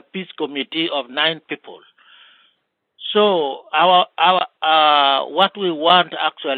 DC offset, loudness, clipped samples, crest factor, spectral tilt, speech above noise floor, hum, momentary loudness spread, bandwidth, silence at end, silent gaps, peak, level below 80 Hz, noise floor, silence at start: under 0.1%; -16 LUFS; under 0.1%; 18 dB; -6.5 dB/octave; 50 dB; none; 13 LU; 4.7 kHz; 0 s; none; 0 dBFS; -78 dBFS; -68 dBFS; 0.15 s